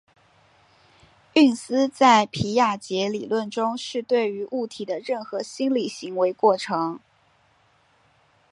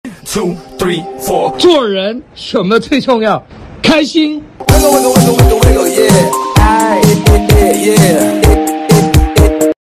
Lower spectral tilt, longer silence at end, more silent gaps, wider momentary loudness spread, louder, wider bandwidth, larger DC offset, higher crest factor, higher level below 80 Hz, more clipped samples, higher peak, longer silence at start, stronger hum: about the same, -4.5 dB/octave vs -5 dB/octave; first, 1.55 s vs 0.15 s; neither; about the same, 11 LU vs 9 LU; second, -23 LUFS vs -10 LUFS; second, 11.5 kHz vs 15 kHz; neither; first, 22 dB vs 10 dB; second, -62 dBFS vs -18 dBFS; second, under 0.1% vs 0.6%; second, -4 dBFS vs 0 dBFS; first, 1.35 s vs 0.05 s; neither